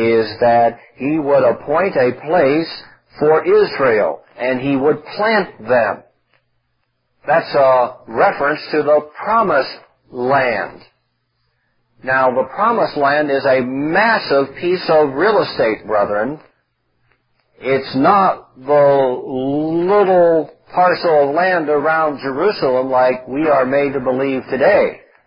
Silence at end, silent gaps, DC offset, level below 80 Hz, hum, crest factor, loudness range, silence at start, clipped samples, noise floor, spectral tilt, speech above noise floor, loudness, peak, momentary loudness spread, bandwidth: 0.3 s; none; under 0.1%; -56 dBFS; none; 16 dB; 4 LU; 0 s; under 0.1%; -67 dBFS; -10.5 dB/octave; 52 dB; -15 LUFS; 0 dBFS; 8 LU; 5.4 kHz